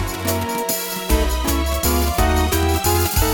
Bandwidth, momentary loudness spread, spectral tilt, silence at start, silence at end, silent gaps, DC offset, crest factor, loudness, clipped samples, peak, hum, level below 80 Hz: 19.5 kHz; 4 LU; -4 dB/octave; 0 s; 0 s; none; 0.2%; 14 dB; -19 LUFS; under 0.1%; -4 dBFS; none; -24 dBFS